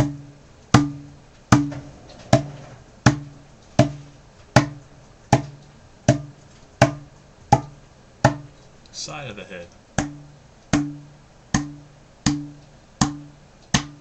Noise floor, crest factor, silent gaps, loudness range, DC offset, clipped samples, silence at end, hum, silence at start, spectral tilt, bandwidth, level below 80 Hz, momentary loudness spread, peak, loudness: -49 dBFS; 24 dB; none; 6 LU; under 0.1%; under 0.1%; 0.1 s; none; 0 s; -5.5 dB/octave; 10.5 kHz; -44 dBFS; 21 LU; 0 dBFS; -23 LUFS